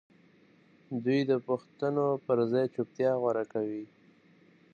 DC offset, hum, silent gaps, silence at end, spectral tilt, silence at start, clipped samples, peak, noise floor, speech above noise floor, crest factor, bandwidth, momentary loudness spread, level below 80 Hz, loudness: under 0.1%; none; none; 0.9 s; -8.5 dB/octave; 0.9 s; under 0.1%; -14 dBFS; -62 dBFS; 32 dB; 16 dB; 7.2 kHz; 9 LU; -80 dBFS; -30 LUFS